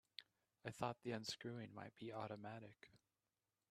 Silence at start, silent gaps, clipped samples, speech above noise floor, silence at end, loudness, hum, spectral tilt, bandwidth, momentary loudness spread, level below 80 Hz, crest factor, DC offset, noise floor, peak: 0.2 s; none; under 0.1%; over 39 dB; 0.75 s; -51 LUFS; none; -5 dB/octave; 13 kHz; 13 LU; -84 dBFS; 26 dB; under 0.1%; under -90 dBFS; -28 dBFS